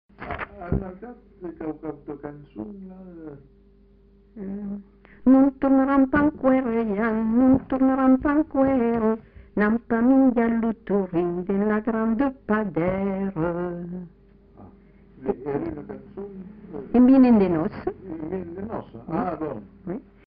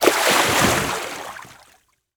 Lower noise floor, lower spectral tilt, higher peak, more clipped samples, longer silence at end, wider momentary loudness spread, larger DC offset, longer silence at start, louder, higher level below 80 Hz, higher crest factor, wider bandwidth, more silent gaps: second, -54 dBFS vs -58 dBFS; first, -8 dB/octave vs -2.5 dB/octave; second, -8 dBFS vs 0 dBFS; neither; second, 0.25 s vs 0.65 s; about the same, 20 LU vs 19 LU; neither; first, 0.2 s vs 0 s; second, -22 LUFS vs -17 LUFS; about the same, -46 dBFS vs -46 dBFS; about the same, 16 dB vs 20 dB; second, 4.7 kHz vs over 20 kHz; neither